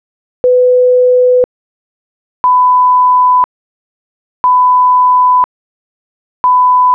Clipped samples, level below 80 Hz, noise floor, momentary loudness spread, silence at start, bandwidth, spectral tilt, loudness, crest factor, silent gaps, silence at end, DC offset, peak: under 0.1%; -58 dBFS; under -90 dBFS; 8 LU; 0.45 s; 2.4 kHz; -5 dB/octave; -9 LUFS; 6 dB; 1.44-2.44 s, 3.44-4.44 s, 5.44-6.44 s; 0 s; under 0.1%; -4 dBFS